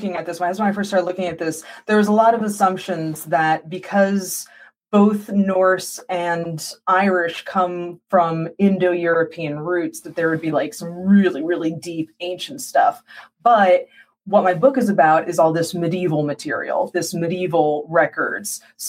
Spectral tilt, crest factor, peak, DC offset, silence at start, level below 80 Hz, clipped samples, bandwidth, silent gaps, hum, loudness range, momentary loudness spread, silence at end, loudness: -5.5 dB/octave; 16 dB; -4 dBFS; under 0.1%; 0 s; -66 dBFS; under 0.1%; 16 kHz; none; none; 3 LU; 11 LU; 0 s; -19 LUFS